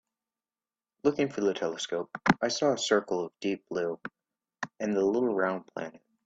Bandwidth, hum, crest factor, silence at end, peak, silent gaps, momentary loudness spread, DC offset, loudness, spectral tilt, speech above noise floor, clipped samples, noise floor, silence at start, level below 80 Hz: 8 kHz; none; 24 dB; 0.3 s; -6 dBFS; none; 14 LU; under 0.1%; -29 LUFS; -4.5 dB/octave; over 61 dB; under 0.1%; under -90 dBFS; 1.05 s; -68 dBFS